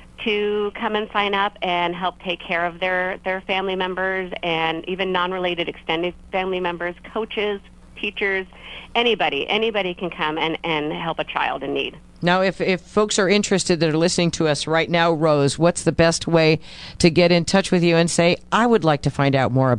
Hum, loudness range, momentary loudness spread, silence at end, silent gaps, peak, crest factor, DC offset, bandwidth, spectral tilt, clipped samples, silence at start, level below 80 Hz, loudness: none; 6 LU; 8 LU; 0 s; none; 0 dBFS; 20 dB; under 0.1%; 11 kHz; -4.5 dB/octave; under 0.1%; 0 s; -46 dBFS; -20 LUFS